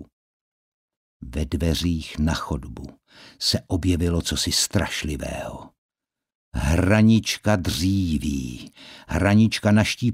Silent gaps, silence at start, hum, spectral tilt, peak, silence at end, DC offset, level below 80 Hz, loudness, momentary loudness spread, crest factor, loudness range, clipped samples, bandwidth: 0.12-0.88 s, 0.97-1.20 s, 5.78-5.89 s, 6.35-6.52 s; 0 s; none; -5 dB/octave; -4 dBFS; 0 s; under 0.1%; -36 dBFS; -22 LUFS; 17 LU; 20 dB; 6 LU; under 0.1%; 16 kHz